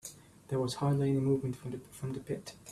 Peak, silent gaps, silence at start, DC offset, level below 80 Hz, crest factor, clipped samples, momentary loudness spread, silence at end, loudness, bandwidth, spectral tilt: -18 dBFS; none; 0.05 s; under 0.1%; -64 dBFS; 16 dB; under 0.1%; 12 LU; 0 s; -34 LUFS; 13.5 kHz; -7 dB/octave